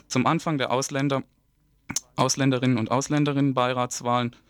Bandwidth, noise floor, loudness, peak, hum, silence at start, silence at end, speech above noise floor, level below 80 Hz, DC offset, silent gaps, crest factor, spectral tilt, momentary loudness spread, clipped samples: 18.5 kHz; -65 dBFS; -24 LUFS; -6 dBFS; none; 0.1 s; 0.2 s; 41 dB; -62 dBFS; under 0.1%; none; 18 dB; -5 dB/octave; 6 LU; under 0.1%